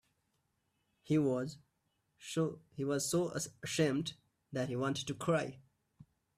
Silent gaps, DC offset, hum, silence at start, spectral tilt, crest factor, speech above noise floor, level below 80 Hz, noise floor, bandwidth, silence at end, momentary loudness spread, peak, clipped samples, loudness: none; under 0.1%; none; 1.05 s; -5 dB/octave; 18 dB; 45 dB; -74 dBFS; -81 dBFS; 15.5 kHz; 0.35 s; 11 LU; -20 dBFS; under 0.1%; -36 LUFS